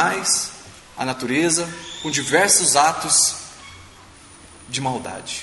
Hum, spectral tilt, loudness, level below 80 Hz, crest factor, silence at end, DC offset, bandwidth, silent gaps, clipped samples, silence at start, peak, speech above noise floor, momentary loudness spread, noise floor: none; -1.5 dB/octave; -18 LUFS; -54 dBFS; 20 dB; 0 s; under 0.1%; 12 kHz; none; under 0.1%; 0 s; -2 dBFS; 25 dB; 18 LU; -45 dBFS